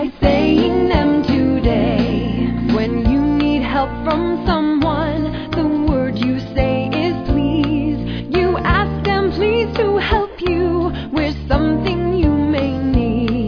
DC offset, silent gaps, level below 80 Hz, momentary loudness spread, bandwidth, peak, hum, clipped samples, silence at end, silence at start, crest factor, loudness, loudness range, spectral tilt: under 0.1%; none; -26 dBFS; 5 LU; 5.4 kHz; 0 dBFS; none; under 0.1%; 0 s; 0 s; 16 dB; -17 LUFS; 2 LU; -8.5 dB/octave